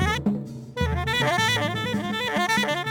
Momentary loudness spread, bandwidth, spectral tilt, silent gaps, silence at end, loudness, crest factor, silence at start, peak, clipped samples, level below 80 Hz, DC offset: 7 LU; over 20 kHz; -4.5 dB/octave; none; 0 s; -24 LUFS; 14 dB; 0 s; -10 dBFS; under 0.1%; -38 dBFS; under 0.1%